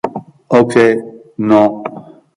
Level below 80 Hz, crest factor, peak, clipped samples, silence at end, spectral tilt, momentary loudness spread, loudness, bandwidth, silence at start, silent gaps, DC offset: -54 dBFS; 14 dB; 0 dBFS; under 0.1%; 0.35 s; -7 dB/octave; 18 LU; -12 LUFS; 11.5 kHz; 0.05 s; none; under 0.1%